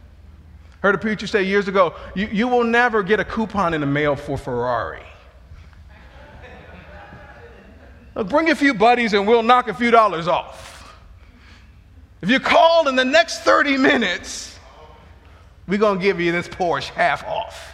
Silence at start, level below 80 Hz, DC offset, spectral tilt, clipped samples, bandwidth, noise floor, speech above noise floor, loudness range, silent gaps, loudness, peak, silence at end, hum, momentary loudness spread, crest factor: 0.55 s; -46 dBFS; under 0.1%; -5 dB/octave; under 0.1%; 13 kHz; -46 dBFS; 28 dB; 9 LU; none; -18 LUFS; 0 dBFS; 0 s; none; 13 LU; 20 dB